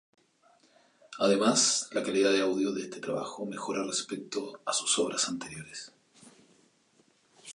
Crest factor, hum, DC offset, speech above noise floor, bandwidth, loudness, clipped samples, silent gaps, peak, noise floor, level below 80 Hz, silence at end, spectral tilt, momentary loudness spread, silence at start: 20 dB; none; under 0.1%; 37 dB; 11.5 kHz; -29 LUFS; under 0.1%; none; -12 dBFS; -67 dBFS; -74 dBFS; 0 s; -2.5 dB/octave; 16 LU; 1.1 s